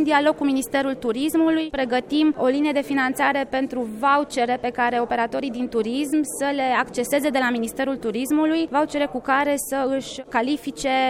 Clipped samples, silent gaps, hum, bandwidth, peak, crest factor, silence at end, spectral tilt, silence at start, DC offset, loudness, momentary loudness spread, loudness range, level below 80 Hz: under 0.1%; none; none; 16.5 kHz; -6 dBFS; 16 dB; 0 s; -3.5 dB/octave; 0 s; under 0.1%; -22 LUFS; 5 LU; 2 LU; -54 dBFS